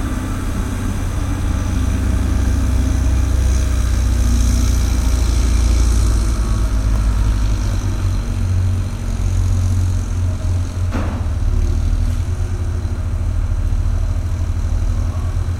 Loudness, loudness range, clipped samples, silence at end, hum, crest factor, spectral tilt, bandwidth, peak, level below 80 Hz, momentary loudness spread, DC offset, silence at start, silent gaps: -19 LUFS; 3 LU; under 0.1%; 0 s; none; 14 dB; -6 dB/octave; 14.5 kHz; -2 dBFS; -18 dBFS; 5 LU; under 0.1%; 0 s; none